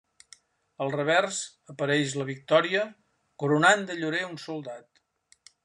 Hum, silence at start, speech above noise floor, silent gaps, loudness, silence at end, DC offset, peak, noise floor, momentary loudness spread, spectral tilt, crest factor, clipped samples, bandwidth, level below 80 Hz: none; 0.8 s; 39 dB; none; -26 LUFS; 0.85 s; under 0.1%; -6 dBFS; -65 dBFS; 15 LU; -4 dB/octave; 22 dB; under 0.1%; 11 kHz; -76 dBFS